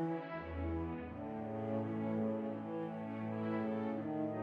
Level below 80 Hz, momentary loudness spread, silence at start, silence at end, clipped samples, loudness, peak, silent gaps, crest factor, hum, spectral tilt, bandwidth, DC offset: -58 dBFS; 6 LU; 0 s; 0 s; under 0.1%; -41 LUFS; -26 dBFS; none; 12 dB; none; -10 dB/octave; 5 kHz; under 0.1%